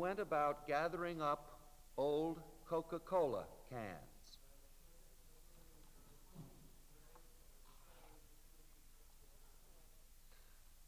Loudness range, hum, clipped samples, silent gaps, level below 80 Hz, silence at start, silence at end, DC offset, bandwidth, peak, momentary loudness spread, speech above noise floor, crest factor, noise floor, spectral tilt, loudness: 24 LU; none; under 0.1%; none; -66 dBFS; 0 s; 0.05 s; under 0.1%; 16 kHz; -26 dBFS; 27 LU; 21 dB; 20 dB; -62 dBFS; -5.5 dB/octave; -42 LUFS